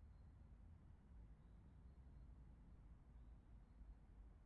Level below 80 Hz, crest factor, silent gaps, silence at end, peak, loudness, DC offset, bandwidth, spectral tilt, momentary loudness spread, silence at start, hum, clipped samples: -64 dBFS; 12 dB; none; 0 s; -52 dBFS; -67 LUFS; under 0.1%; 4.2 kHz; -8.5 dB/octave; 2 LU; 0 s; none; under 0.1%